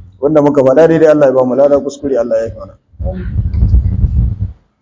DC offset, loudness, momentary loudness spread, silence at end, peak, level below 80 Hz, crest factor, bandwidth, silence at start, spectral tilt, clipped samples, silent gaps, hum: under 0.1%; -11 LUFS; 15 LU; 0.3 s; 0 dBFS; -18 dBFS; 12 dB; 7.8 kHz; 0.2 s; -8.5 dB/octave; 0.8%; none; none